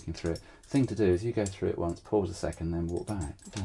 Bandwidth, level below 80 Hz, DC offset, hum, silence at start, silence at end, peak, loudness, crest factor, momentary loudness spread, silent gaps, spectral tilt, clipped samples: 11.5 kHz; -50 dBFS; under 0.1%; none; 0 s; 0 s; -16 dBFS; -32 LUFS; 16 dB; 9 LU; none; -7 dB/octave; under 0.1%